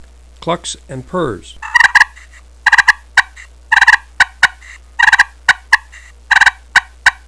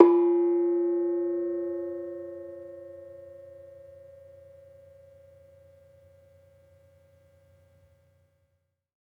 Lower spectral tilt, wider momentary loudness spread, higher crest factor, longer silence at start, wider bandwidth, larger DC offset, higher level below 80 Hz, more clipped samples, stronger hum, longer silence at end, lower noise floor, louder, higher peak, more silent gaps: second, -1.5 dB/octave vs -9.5 dB/octave; second, 14 LU vs 27 LU; second, 14 dB vs 28 dB; first, 0.45 s vs 0 s; first, 11 kHz vs 2.6 kHz; first, 0.3% vs under 0.1%; first, -40 dBFS vs -78 dBFS; first, 0.9% vs under 0.1%; neither; second, 0.15 s vs 5.35 s; second, -39 dBFS vs -76 dBFS; first, -11 LUFS vs -27 LUFS; about the same, 0 dBFS vs -2 dBFS; neither